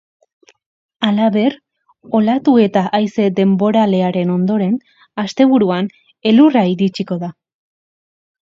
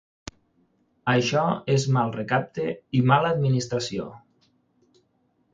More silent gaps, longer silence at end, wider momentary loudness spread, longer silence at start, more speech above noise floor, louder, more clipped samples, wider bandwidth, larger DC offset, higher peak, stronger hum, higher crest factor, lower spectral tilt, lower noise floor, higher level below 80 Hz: neither; second, 1.15 s vs 1.35 s; second, 11 LU vs 16 LU; about the same, 1 s vs 1.05 s; first, over 76 dB vs 45 dB; first, -15 LUFS vs -24 LUFS; neither; about the same, 7.4 kHz vs 7.8 kHz; neither; first, 0 dBFS vs -4 dBFS; neither; about the same, 16 dB vs 20 dB; first, -7.5 dB/octave vs -6 dB/octave; first, under -90 dBFS vs -68 dBFS; about the same, -62 dBFS vs -60 dBFS